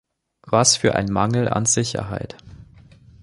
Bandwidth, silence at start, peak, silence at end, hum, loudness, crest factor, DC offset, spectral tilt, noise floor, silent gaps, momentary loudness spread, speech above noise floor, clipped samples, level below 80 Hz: 11.5 kHz; 0.45 s; -2 dBFS; 0.6 s; none; -19 LUFS; 20 dB; under 0.1%; -3.5 dB/octave; -48 dBFS; none; 14 LU; 28 dB; under 0.1%; -46 dBFS